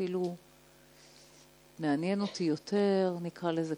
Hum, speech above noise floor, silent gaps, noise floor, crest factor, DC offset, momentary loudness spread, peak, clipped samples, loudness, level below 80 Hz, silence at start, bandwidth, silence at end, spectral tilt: none; 28 dB; none; -60 dBFS; 16 dB; under 0.1%; 8 LU; -18 dBFS; under 0.1%; -32 LUFS; -74 dBFS; 0 s; 18.5 kHz; 0 s; -6.5 dB/octave